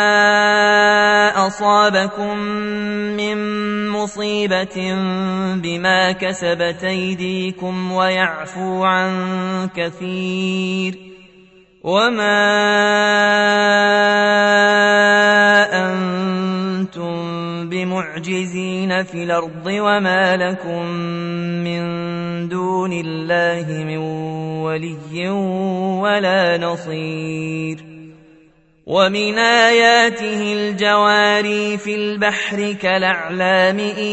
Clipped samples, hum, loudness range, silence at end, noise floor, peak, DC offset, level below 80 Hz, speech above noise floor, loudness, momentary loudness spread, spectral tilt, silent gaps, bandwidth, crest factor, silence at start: under 0.1%; none; 8 LU; 0 s; -52 dBFS; 0 dBFS; under 0.1%; -58 dBFS; 35 dB; -16 LUFS; 12 LU; -4.5 dB/octave; none; 8.4 kHz; 18 dB; 0 s